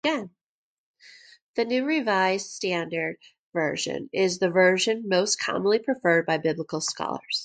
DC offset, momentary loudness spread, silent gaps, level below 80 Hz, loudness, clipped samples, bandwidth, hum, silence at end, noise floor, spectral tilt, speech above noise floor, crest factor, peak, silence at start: under 0.1%; 11 LU; 0.43-0.94 s, 1.42-1.54 s, 3.38-3.53 s; -72 dBFS; -25 LUFS; under 0.1%; 9.4 kHz; none; 0 s; -52 dBFS; -3.5 dB/octave; 27 dB; 18 dB; -8 dBFS; 0.05 s